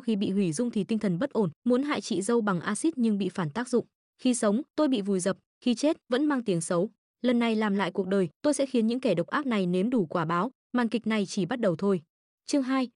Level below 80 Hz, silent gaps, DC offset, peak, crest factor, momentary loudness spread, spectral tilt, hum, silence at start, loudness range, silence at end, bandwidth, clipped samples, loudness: -74 dBFS; 1.56-1.62 s, 3.95-4.13 s, 4.70-4.74 s, 5.46-5.61 s, 6.98-7.14 s, 8.36-8.40 s, 10.55-10.70 s, 12.10-12.38 s; under 0.1%; -14 dBFS; 14 dB; 4 LU; -5.5 dB/octave; none; 0.05 s; 1 LU; 0.1 s; 11 kHz; under 0.1%; -28 LUFS